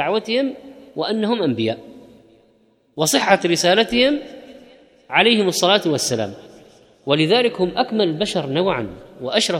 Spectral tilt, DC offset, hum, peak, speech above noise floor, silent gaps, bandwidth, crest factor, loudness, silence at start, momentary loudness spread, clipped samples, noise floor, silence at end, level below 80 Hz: -3.5 dB/octave; under 0.1%; none; -2 dBFS; 40 dB; none; 17 kHz; 18 dB; -18 LUFS; 0 s; 16 LU; under 0.1%; -58 dBFS; 0 s; -54 dBFS